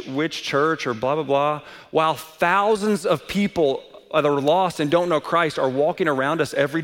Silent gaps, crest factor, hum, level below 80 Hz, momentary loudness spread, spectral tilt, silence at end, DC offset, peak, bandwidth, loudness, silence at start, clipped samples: none; 16 dB; none; -58 dBFS; 5 LU; -5.5 dB/octave; 0 s; under 0.1%; -6 dBFS; 17 kHz; -21 LUFS; 0 s; under 0.1%